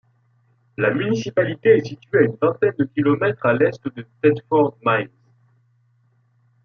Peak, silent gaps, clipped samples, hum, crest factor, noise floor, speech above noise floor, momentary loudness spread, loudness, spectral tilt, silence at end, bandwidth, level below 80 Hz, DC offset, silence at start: -2 dBFS; none; under 0.1%; none; 18 dB; -61 dBFS; 42 dB; 6 LU; -19 LUFS; -7.5 dB/octave; 1.6 s; 6.8 kHz; -64 dBFS; under 0.1%; 0.8 s